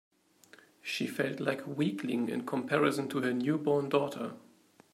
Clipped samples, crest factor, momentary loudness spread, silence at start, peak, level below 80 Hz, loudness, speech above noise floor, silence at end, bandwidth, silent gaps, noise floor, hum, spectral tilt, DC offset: under 0.1%; 20 dB; 8 LU; 0.85 s; -12 dBFS; -80 dBFS; -32 LUFS; 29 dB; 0.55 s; 16 kHz; none; -61 dBFS; none; -6 dB/octave; under 0.1%